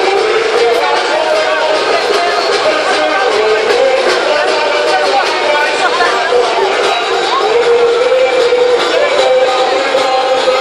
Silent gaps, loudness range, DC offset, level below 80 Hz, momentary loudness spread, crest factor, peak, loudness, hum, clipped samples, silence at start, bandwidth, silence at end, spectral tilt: none; 1 LU; under 0.1%; -52 dBFS; 2 LU; 10 dB; 0 dBFS; -11 LUFS; none; under 0.1%; 0 s; 12.5 kHz; 0 s; -1.5 dB/octave